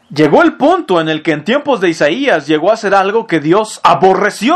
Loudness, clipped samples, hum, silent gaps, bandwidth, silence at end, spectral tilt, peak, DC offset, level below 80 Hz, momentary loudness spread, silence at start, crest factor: -11 LUFS; 0.5%; none; none; 12.5 kHz; 0 s; -5 dB/octave; 0 dBFS; under 0.1%; -52 dBFS; 5 LU; 0.1 s; 12 dB